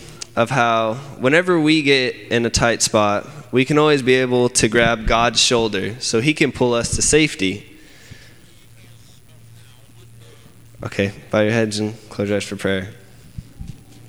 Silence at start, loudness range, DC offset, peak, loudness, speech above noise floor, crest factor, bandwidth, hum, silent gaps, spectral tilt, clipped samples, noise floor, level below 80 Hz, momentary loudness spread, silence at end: 0 s; 9 LU; 0.4%; -2 dBFS; -17 LUFS; 29 dB; 18 dB; 16 kHz; none; none; -3.5 dB/octave; under 0.1%; -47 dBFS; -40 dBFS; 12 LU; 0.35 s